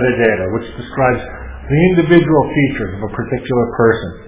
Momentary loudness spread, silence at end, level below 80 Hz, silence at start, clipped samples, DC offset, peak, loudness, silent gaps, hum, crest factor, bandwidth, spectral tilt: 12 LU; 0 s; -34 dBFS; 0 s; under 0.1%; under 0.1%; 0 dBFS; -15 LUFS; none; none; 14 dB; 4 kHz; -11.5 dB/octave